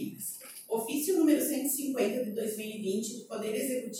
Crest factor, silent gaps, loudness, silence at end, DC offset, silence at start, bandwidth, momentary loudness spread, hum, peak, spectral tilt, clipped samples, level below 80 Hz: 18 dB; none; -31 LUFS; 0 s; under 0.1%; 0 s; 17 kHz; 11 LU; none; -14 dBFS; -4 dB/octave; under 0.1%; -84 dBFS